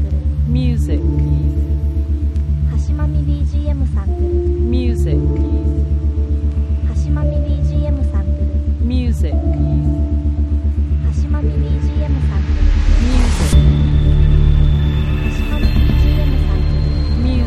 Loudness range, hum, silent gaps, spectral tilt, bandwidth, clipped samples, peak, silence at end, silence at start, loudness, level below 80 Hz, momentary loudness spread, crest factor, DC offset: 3 LU; none; none; -8 dB/octave; 10.5 kHz; under 0.1%; -2 dBFS; 0 s; 0 s; -17 LUFS; -16 dBFS; 5 LU; 12 dB; under 0.1%